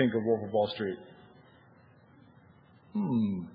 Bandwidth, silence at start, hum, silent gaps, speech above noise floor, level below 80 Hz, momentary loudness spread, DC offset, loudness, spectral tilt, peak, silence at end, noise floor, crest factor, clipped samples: 5.2 kHz; 0 s; none; none; 29 dB; -74 dBFS; 12 LU; under 0.1%; -31 LUFS; -10.5 dB/octave; -12 dBFS; 0 s; -59 dBFS; 20 dB; under 0.1%